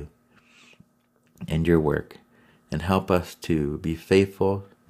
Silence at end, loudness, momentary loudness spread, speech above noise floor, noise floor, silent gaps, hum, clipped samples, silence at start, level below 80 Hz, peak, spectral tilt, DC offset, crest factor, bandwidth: 0.25 s; -24 LUFS; 10 LU; 41 dB; -65 dBFS; none; none; under 0.1%; 0 s; -44 dBFS; -6 dBFS; -7 dB/octave; under 0.1%; 20 dB; 16 kHz